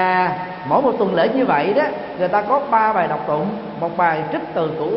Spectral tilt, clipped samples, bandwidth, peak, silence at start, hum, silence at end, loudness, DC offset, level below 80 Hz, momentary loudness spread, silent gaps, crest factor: -11 dB/octave; under 0.1%; 5.8 kHz; -4 dBFS; 0 s; none; 0 s; -19 LUFS; under 0.1%; -56 dBFS; 7 LU; none; 16 dB